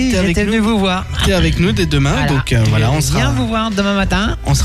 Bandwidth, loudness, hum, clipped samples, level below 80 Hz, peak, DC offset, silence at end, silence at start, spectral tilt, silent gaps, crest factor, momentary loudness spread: 15 kHz; -14 LUFS; none; under 0.1%; -24 dBFS; -4 dBFS; under 0.1%; 0 s; 0 s; -5.5 dB/octave; none; 10 dB; 3 LU